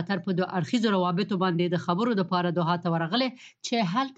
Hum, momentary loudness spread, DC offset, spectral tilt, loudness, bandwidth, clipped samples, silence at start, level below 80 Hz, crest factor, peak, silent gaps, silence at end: none; 3 LU; under 0.1%; -6 dB/octave; -26 LUFS; 8 kHz; under 0.1%; 0 s; -72 dBFS; 16 dB; -10 dBFS; none; 0.05 s